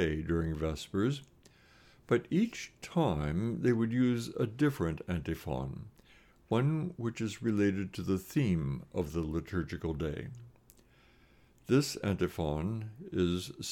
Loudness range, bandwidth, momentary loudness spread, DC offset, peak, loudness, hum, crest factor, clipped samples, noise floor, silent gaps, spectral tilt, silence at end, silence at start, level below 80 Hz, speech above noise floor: 4 LU; 17.5 kHz; 8 LU; under 0.1%; -16 dBFS; -33 LUFS; none; 18 dB; under 0.1%; -63 dBFS; none; -6.5 dB/octave; 0 s; 0 s; -54 dBFS; 30 dB